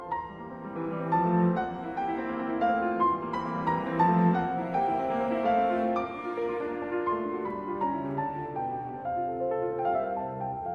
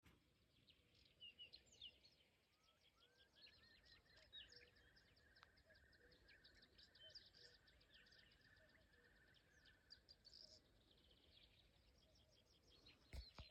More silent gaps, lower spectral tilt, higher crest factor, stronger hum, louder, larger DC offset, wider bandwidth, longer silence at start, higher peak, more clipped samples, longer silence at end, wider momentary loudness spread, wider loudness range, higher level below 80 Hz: neither; first, -9 dB/octave vs -3 dB/octave; second, 18 dB vs 24 dB; neither; first, -29 LUFS vs -65 LUFS; neither; second, 6 kHz vs 8.4 kHz; about the same, 0 s vs 0 s; first, -12 dBFS vs -46 dBFS; neither; about the same, 0 s vs 0 s; about the same, 9 LU vs 8 LU; about the same, 5 LU vs 3 LU; first, -58 dBFS vs -76 dBFS